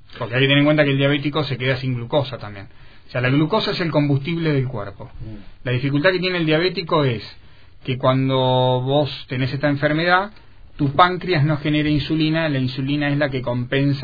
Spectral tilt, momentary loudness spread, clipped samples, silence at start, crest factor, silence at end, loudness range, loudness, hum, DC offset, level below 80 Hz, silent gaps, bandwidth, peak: -8.5 dB/octave; 13 LU; under 0.1%; 0.1 s; 20 dB; 0 s; 3 LU; -19 LUFS; none; 0.6%; -44 dBFS; none; 5 kHz; 0 dBFS